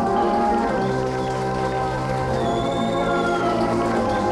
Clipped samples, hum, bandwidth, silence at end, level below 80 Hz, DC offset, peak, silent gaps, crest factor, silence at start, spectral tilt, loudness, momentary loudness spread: under 0.1%; none; 12.5 kHz; 0 s; -40 dBFS; under 0.1%; -10 dBFS; none; 12 dB; 0 s; -6.5 dB/octave; -22 LUFS; 4 LU